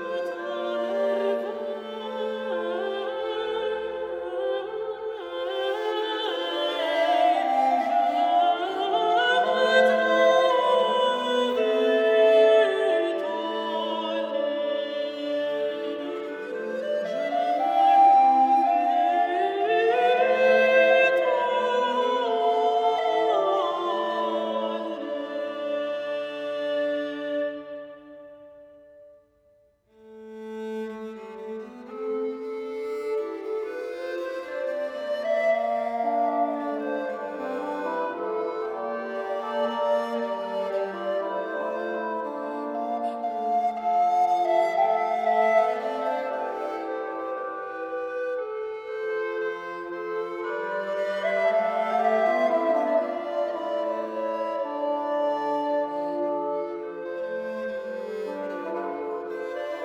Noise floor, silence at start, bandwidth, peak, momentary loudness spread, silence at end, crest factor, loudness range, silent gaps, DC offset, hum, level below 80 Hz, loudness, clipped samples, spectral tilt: -62 dBFS; 0 s; 9.6 kHz; -6 dBFS; 12 LU; 0 s; 20 dB; 11 LU; none; under 0.1%; none; -72 dBFS; -25 LUFS; under 0.1%; -4 dB/octave